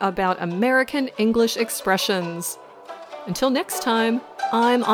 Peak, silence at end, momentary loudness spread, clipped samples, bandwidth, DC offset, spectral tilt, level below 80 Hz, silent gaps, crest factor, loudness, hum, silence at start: -6 dBFS; 0 s; 14 LU; under 0.1%; 19.5 kHz; under 0.1%; -4 dB/octave; -56 dBFS; none; 16 dB; -22 LUFS; none; 0 s